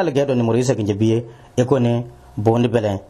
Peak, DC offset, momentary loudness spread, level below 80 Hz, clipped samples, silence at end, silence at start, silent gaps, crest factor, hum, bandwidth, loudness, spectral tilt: -2 dBFS; under 0.1%; 7 LU; -50 dBFS; under 0.1%; 0.05 s; 0 s; none; 16 dB; none; 12 kHz; -19 LUFS; -7 dB/octave